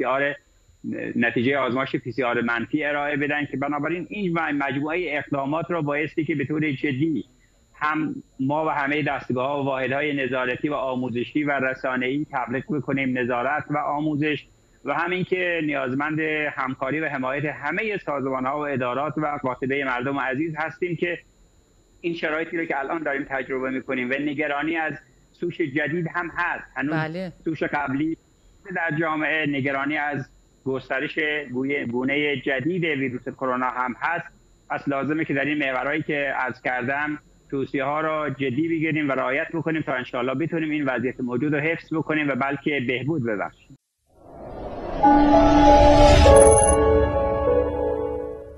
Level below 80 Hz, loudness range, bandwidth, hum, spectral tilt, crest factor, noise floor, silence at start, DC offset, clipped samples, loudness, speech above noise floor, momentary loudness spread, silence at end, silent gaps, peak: -36 dBFS; 8 LU; 12 kHz; none; -5 dB/octave; 22 dB; -57 dBFS; 0 s; under 0.1%; under 0.1%; -23 LUFS; 34 dB; 8 LU; 0 s; none; -2 dBFS